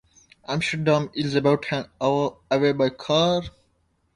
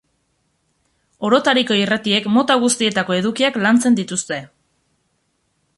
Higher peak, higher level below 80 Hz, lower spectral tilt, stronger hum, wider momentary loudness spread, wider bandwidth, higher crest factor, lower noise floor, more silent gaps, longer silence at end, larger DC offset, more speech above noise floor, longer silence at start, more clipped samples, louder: second, -6 dBFS vs -2 dBFS; first, -56 dBFS vs -62 dBFS; first, -5.5 dB/octave vs -3.5 dB/octave; neither; about the same, 8 LU vs 8 LU; about the same, 11 kHz vs 11.5 kHz; about the same, 18 dB vs 16 dB; about the same, -68 dBFS vs -67 dBFS; neither; second, 0.65 s vs 1.3 s; neither; second, 45 dB vs 51 dB; second, 0.5 s vs 1.2 s; neither; second, -23 LUFS vs -17 LUFS